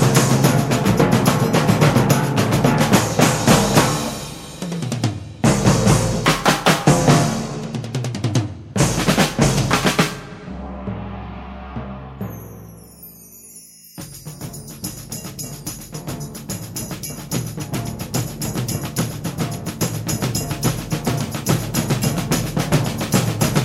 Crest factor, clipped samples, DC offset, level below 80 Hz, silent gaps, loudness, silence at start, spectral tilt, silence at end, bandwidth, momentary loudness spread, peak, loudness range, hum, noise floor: 18 dB; under 0.1%; under 0.1%; -38 dBFS; none; -19 LUFS; 0 s; -5 dB/octave; 0 s; 16.5 kHz; 18 LU; 0 dBFS; 17 LU; none; -42 dBFS